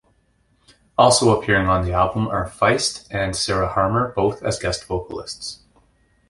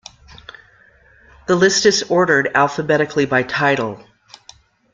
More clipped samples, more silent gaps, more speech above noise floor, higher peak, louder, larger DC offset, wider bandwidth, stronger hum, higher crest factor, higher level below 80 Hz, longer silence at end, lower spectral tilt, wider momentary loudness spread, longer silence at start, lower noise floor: neither; neither; first, 43 dB vs 35 dB; about the same, -2 dBFS vs -2 dBFS; second, -20 LUFS vs -16 LUFS; neither; first, 11.5 kHz vs 9.4 kHz; neither; about the same, 18 dB vs 18 dB; first, -38 dBFS vs -54 dBFS; second, 0.75 s vs 0.95 s; about the same, -4 dB/octave vs -3.5 dB/octave; first, 12 LU vs 9 LU; second, 1 s vs 1.5 s; first, -62 dBFS vs -51 dBFS